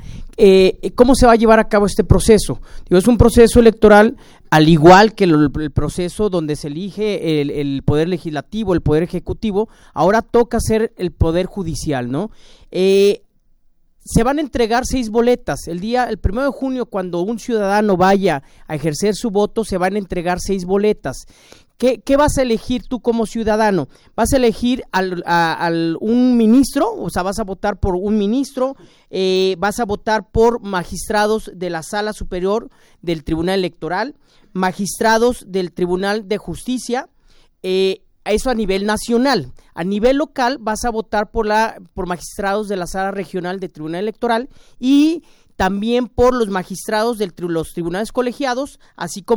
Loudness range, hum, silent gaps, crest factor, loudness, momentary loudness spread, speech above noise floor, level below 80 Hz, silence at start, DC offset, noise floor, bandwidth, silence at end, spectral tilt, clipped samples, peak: 8 LU; none; none; 16 dB; -17 LUFS; 12 LU; 37 dB; -32 dBFS; 0 s; under 0.1%; -53 dBFS; over 20 kHz; 0 s; -5.5 dB/octave; under 0.1%; 0 dBFS